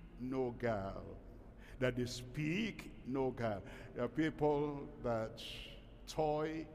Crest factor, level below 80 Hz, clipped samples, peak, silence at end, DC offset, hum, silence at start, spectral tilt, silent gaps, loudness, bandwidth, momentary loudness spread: 18 dB; -58 dBFS; under 0.1%; -22 dBFS; 0 s; under 0.1%; none; 0 s; -6 dB/octave; none; -40 LUFS; 15 kHz; 16 LU